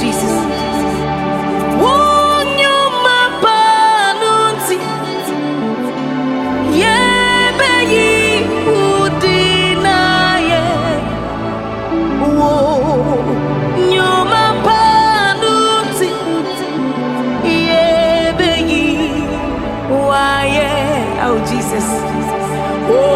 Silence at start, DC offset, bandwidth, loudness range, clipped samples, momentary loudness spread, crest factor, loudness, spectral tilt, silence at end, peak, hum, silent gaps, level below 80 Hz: 0 s; under 0.1%; 16.5 kHz; 4 LU; under 0.1%; 8 LU; 12 dB; -13 LUFS; -4.5 dB/octave; 0 s; 0 dBFS; none; none; -36 dBFS